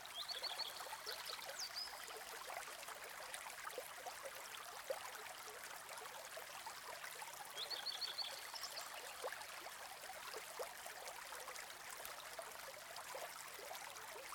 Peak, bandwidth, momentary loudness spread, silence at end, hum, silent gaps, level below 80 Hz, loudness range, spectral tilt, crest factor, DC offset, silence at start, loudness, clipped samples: -26 dBFS; 19 kHz; 7 LU; 0 s; none; none; -82 dBFS; 3 LU; 0.5 dB/octave; 24 dB; under 0.1%; 0 s; -49 LUFS; under 0.1%